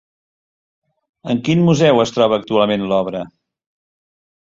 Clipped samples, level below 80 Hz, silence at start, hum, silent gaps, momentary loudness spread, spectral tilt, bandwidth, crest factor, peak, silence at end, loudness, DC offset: under 0.1%; -54 dBFS; 1.25 s; none; none; 15 LU; -6.5 dB/octave; 7.6 kHz; 16 dB; -2 dBFS; 1.15 s; -16 LUFS; under 0.1%